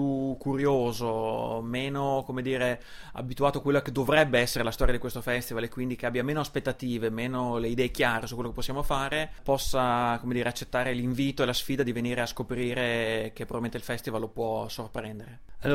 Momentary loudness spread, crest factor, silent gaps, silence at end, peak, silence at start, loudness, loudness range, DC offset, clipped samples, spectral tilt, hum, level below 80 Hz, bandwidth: 8 LU; 20 dB; none; 0 s; -8 dBFS; 0 s; -29 LUFS; 3 LU; under 0.1%; under 0.1%; -5 dB/octave; none; -42 dBFS; 16 kHz